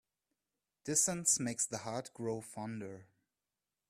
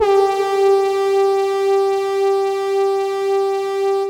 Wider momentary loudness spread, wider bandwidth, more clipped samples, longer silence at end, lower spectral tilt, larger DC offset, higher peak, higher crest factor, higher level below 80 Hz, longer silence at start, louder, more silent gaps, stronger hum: first, 18 LU vs 4 LU; first, 15.5 kHz vs 13.5 kHz; neither; first, 0.85 s vs 0 s; about the same, -3 dB/octave vs -3.5 dB/octave; neither; second, -16 dBFS vs -4 dBFS; first, 22 dB vs 12 dB; second, -76 dBFS vs -60 dBFS; first, 0.85 s vs 0 s; second, -35 LUFS vs -17 LUFS; neither; neither